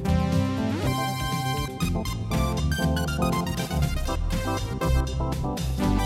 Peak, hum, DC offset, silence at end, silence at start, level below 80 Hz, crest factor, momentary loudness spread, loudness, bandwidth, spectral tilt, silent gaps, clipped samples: -10 dBFS; none; under 0.1%; 0 s; 0 s; -30 dBFS; 14 dB; 4 LU; -26 LUFS; 16 kHz; -5.5 dB/octave; none; under 0.1%